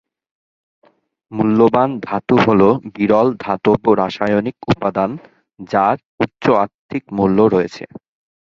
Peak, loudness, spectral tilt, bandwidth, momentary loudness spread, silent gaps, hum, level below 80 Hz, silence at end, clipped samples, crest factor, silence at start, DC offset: 0 dBFS; -16 LUFS; -8 dB/octave; 7.2 kHz; 11 LU; 6.05-6.18 s, 6.74-6.89 s; none; -50 dBFS; 0.7 s; under 0.1%; 16 dB; 1.3 s; under 0.1%